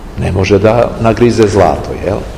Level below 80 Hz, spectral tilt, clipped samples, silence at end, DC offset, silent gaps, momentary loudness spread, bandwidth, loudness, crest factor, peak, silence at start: -26 dBFS; -7 dB/octave; 2%; 0 s; 0.9%; none; 8 LU; 14 kHz; -10 LUFS; 10 dB; 0 dBFS; 0 s